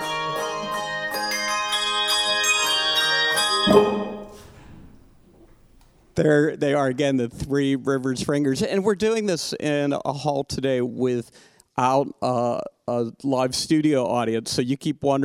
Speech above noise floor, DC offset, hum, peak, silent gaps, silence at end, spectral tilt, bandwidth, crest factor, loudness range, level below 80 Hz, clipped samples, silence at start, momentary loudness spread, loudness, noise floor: 32 dB; under 0.1%; none; -4 dBFS; none; 0 s; -4 dB/octave; 19 kHz; 20 dB; 5 LU; -54 dBFS; under 0.1%; 0 s; 8 LU; -22 LUFS; -54 dBFS